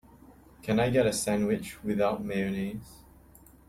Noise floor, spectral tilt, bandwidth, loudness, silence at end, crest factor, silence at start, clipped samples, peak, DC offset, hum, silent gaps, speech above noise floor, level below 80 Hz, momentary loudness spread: -55 dBFS; -5.5 dB/octave; 15.5 kHz; -29 LUFS; 0.7 s; 18 dB; 0.3 s; under 0.1%; -14 dBFS; under 0.1%; none; none; 27 dB; -54 dBFS; 11 LU